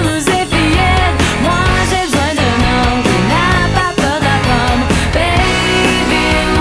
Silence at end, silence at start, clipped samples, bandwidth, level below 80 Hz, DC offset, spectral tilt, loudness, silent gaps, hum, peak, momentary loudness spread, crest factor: 0 s; 0 s; under 0.1%; 11 kHz; -22 dBFS; under 0.1%; -4.5 dB/octave; -12 LUFS; none; none; 0 dBFS; 2 LU; 12 dB